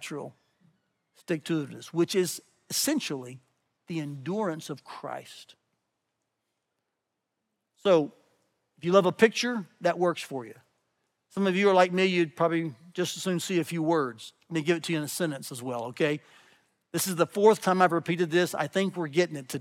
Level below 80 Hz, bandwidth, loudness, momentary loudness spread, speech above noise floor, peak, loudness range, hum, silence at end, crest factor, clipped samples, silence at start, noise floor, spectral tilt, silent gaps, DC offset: -86 dBFS; 17.5 kHz; -27 LUFS; 16 LU; 56 dB; -6 dBFS; 11 LU; none; 0 s; 22 dB; under 0.1%; 0 s; -83 dBFS; -4.5 dB/octave; none; under 0.1%